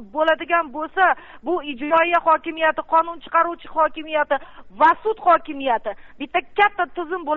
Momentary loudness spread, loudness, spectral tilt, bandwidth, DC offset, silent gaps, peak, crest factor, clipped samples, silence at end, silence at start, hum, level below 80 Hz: 9 LU; -20 LUFS; 0 dB/octave; 5.2 kHz; under 0.1%; none; -6 dBFS; 14 dB; under 0.1%; 0 s; 0 s; none; -54 dBFS